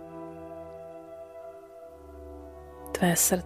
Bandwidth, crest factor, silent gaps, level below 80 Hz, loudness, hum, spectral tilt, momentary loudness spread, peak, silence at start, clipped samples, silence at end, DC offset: 15.5 kHz; 22 dB; none; -54 dBFS; -29 LUFS; none; -3.5 dB/octave; 23 LU; -12 dBFS; 0 s; under 0.1%; 0 s; under 0.1%